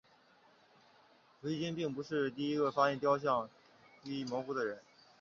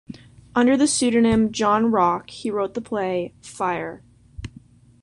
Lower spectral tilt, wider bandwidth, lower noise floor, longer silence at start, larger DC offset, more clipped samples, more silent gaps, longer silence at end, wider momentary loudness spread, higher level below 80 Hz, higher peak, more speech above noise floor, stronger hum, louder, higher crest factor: about the same, -4.5 dB/octave vs -4.5 dB/octave; second, 7.2 kHz vs 11 kHz; first, -66 dBFS vs -49 dBFS; first, 1.45 s vs 0.1 s; neither; neither; neither; second, 0.4 s vs 0.55 s; second, 14 LU vs 21 LU; second, -78 dBFS vs -50 dBFS; second, -16 dBFS vs -6 dBFS; about the same, 31 dB vs 28 dB; neither; second, -36 LUFS vs -21 LUFS; about the same, 20 dB vs 16 dB